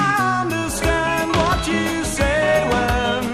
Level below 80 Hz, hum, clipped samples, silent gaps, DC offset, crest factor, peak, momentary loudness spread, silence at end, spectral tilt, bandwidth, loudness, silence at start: -30 dBFS; none; under 0.1%; none; under 0.1%; 16 dB; -4 dBFS; 4 LU; 0 s; -4.5 dB/octave; 16 kHz; -19 LUFS; 0 s